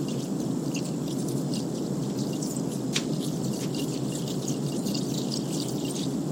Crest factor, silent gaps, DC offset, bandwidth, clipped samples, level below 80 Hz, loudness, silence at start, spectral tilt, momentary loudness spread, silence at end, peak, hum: 18 dB; none; under 0.1%; 16.5 kHz; under 0.1%; -60 dBFS; -30 LUFS; 0 s; -5 dB/octave; 2 LU; 0 s; -10 dBFS; none